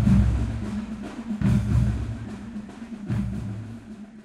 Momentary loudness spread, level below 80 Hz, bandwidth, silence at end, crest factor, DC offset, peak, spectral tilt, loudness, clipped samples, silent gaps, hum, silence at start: 16 LU; -32 dBFS; 11 kHz; 0 s; 18 dB; under 0.1%; -8 dBFS; -8.5 dB/octave; -27 LUFS; under 0.1%; none; none; 0 s